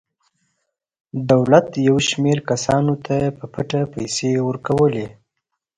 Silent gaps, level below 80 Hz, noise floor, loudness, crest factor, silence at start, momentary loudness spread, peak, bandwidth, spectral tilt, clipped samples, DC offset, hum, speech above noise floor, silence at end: none; -50 dBFS; -78 dBFS; -19 LUFS; 20 dB; 1.15 s; 13 LU; 0 dBFS; 10.5 kHz; -5.5 dB/octave; under 0.1%; under 0.1%; none; 60 dB; 0.65 s